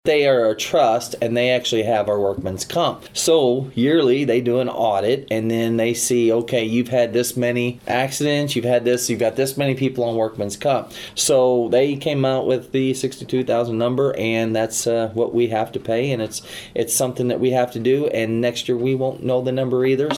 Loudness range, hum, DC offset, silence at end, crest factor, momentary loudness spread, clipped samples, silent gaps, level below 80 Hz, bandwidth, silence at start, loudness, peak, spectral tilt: 2 LU; none; under 0.1%; 0 s; 14 dB; 6 LU; under 0.1%; none; -58 dBFS; 17.5 kHz; 0.05 s; -20 LUFS; -4 dBFS; -4.5 dB/octave